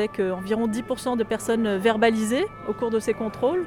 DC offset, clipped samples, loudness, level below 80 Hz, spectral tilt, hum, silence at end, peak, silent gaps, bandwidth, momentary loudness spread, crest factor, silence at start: under 0.1%; under 0.1%; -24 LUFS; -54 dBFS; -5 dB/octave; none; 0 s; -8 dBFS; none; 16 kHz; 7 LU; 16 dB; 0 s